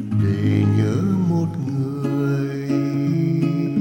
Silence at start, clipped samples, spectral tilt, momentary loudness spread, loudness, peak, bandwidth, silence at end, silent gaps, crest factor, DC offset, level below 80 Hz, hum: 0 s; under 0.1%; -9 dB/octave; 5 LU; -21 LUFS; -6 dBFS; 16 kHz; 0 s; none; 14 dB; under 0.1%; -54 dBFS; none